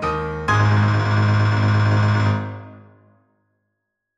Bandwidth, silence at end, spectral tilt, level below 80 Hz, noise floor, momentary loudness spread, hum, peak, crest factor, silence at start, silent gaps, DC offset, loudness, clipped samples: 7.4 kHz; 1.4 s; -7 dB/octave; -44 dBFS; -77 dBFS; 8 LU; none; -6 dBFS; 14 dB; 0 s; none; under 0.1%; -18 LUFS; under 0.1%